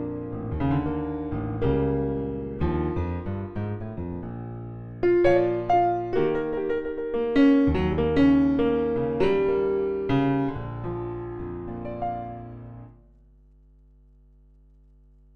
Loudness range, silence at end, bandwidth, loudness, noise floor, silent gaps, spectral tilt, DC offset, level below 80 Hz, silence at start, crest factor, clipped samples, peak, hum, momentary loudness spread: 14 LU; 2.45 s; 6.2 kHz; -25 LUFS; -54 dBFS; none; -9.5 dB/octave; under 0.1%; -40 dBFS; 0 s; 18 dB; under 0.1%; -8 dBFS; 50 Hz at -55 dBFS; 15 LU